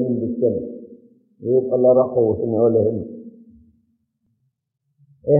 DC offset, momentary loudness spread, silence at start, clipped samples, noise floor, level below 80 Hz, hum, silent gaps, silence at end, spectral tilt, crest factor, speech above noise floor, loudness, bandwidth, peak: under 0.1%; 19 LU; 0 s; under 0.1%; -74 dBFS; -58 dBFS; none; none; 0 s; -12 dB/octave; 16 dB; 56 dB; -19 LUFS; 2 kHz; -4 dBFS